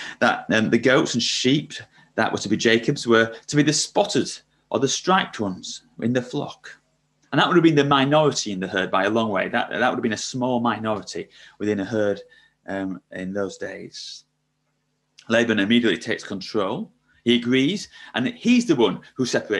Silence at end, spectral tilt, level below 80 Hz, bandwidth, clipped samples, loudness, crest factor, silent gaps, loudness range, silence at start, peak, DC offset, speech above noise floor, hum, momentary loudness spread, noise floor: 0 s; -4.5 dB/octave; -60 dBFS; 11.5 kHz; under 0.1%; -22 LUFS; 20 dB; none; 8 LU; 0 s; -4 dBFS; under 0.1%; 50 dB; none; 15 LU; -72 dBFS